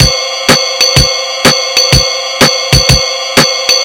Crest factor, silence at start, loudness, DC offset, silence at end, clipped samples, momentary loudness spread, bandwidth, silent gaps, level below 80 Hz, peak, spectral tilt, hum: 10 dB; 0 s; -7 LUFS; under 0.1%; 0 s; 3%; 3 LU; over 20 kHz; none; -22 dBFS; 0 dBFS; -2.5 dB/octave; none